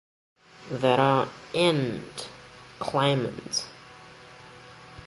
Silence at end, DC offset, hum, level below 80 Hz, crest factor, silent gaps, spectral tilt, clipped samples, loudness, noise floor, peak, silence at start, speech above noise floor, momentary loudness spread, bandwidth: 0 s; under 0.1%; none; -62 dBFS; 22 dB; none; -5 dB/octave; under 0.1%; -26 LUFS; -48 dBFS; -8 dBFS; 0.6 s; 23 dB; 25 LU; 11.5 kHz